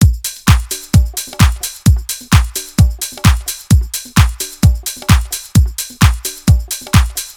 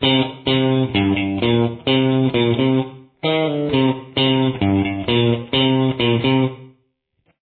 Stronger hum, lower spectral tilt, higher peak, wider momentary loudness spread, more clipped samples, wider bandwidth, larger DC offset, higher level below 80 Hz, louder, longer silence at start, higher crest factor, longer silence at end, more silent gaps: neither; second, -4.5 dB/octave vs -9.5 dB/octave; first, 0 dBFS vs -4 dBFS; about the same, 3 LU vs 3 LU; first, 0.5% vs under 0.1%; first, over 20 kHz vs 4.5 kHz; neither; first, -18 dBFS vs -48 dBFS; first, -14 LUFS vs -18 LUFS; about the same, 0 s vs 0 s; about the same, 12 dB vs 14 dB; second, 0.05 s vs 0.75 s; neither